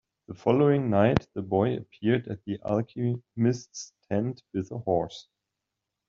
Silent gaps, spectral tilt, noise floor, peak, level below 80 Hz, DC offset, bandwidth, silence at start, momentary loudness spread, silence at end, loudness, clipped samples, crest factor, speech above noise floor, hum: none; -7 dB/octave; -85 dBFS; -4 dBFS; -58 dBFS; under 0.1%; 7.6 kHz; 0.3 s; 13 LU; 0.85 s; -27 LUFS; under 0.1%; 24 dB; 58 dB; none